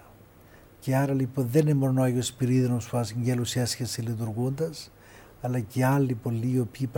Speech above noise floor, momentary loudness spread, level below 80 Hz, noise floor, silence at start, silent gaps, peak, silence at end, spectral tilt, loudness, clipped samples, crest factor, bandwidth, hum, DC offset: 27 dB; 8 LU; -58 dBFS; -53 dBFS; 0.8 s; none; -10 dBFS; 0 s; -6.5 dB/octave; -27 LUFS; under 0.1%; 16 dB; 17 kHz; none; under 0.1%